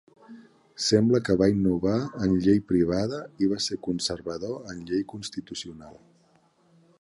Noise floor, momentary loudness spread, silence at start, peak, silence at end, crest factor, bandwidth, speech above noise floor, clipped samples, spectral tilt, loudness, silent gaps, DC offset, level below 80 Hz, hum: -63 dBFS; 14 LU; 0.3 s; -8 dBFS; 1.05 s; 20 dB; 11.5 kHz; 38 dB; under 0.1%; -5.5 dB/octave; -26 LUFS; none; under 0.1%; -52 dBFS; none